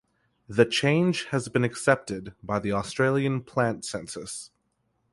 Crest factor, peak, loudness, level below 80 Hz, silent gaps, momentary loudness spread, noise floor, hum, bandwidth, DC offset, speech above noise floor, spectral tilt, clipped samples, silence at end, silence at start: 22 dB; -4 dBFS; -26 LUFS; -58 dBFS; none; 13 LU; -73 dBFS; none; 11.5 kHz; under 0.1%; 48 dB; -5 dB/octave; under 0.1%; 0.65 s; 0.5 s